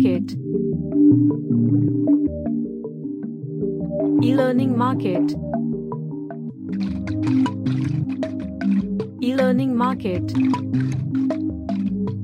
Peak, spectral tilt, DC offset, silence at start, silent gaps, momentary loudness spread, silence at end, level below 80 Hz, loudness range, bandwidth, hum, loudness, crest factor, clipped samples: -6 dBFS; -9 dB/octave; under 0.1%; 0 s; none; 11 LU; 0 s; -46 dBFS; 4 LU; 9.6 kHz; none; -22 LUFS; 14 dB; under 0.1%